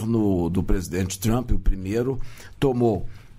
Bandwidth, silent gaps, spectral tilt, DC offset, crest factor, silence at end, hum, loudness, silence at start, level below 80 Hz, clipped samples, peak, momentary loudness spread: 15.5 kHz; none; -6.5 dB/octave; under 0.1%; 14 dB; 0 s; none; -25 LUFS; 0 s; -28 dBFS; under 0.1%; -8 dBFS; 7 LU